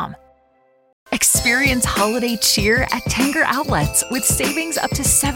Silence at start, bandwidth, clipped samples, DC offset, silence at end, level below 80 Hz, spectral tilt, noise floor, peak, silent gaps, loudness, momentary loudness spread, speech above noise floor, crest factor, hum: 0 s; 17 kHz; under 0.1%; under 0.1%; 0 s; -34 dBFS; -2.5 dB/octave; -57 dBFS; -2 dBFS; 0.93-1.06 s; -16 LUFS; 6 LU; 40 dB; 16 dB; none